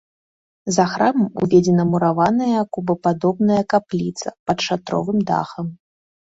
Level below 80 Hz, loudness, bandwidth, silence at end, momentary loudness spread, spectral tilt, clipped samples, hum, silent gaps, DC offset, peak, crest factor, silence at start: -56 dBFS; -19 LUFS; 8 kHz; 0.55 s; 10 LU; -6 dB/octave; under 0.1%; none; 4.39-4.46 s; under 0.1%; -2 dBFS; 16 dB; 0.65 s